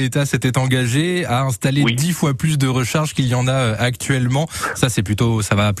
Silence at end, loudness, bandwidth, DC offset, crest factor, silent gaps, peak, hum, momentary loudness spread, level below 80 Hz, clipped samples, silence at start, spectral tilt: 0 s; -18 LUFS; 14 kHz; under 0.1%; 14 dB; none; -4 dBFS; none; 2 LU; -44 dBFS; under 0.1%; 0 s; -5 dB/octave